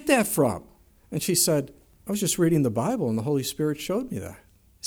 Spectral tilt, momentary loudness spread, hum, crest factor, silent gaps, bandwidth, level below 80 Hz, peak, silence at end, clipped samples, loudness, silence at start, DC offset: -4.5 dB/octave; 14 LU; none; 20 dB; none; over 20 kHz; -56 dBFS; -6 dBFS; 0 s; under 0.1%; -25 LUFS; 0 s; under 0.1%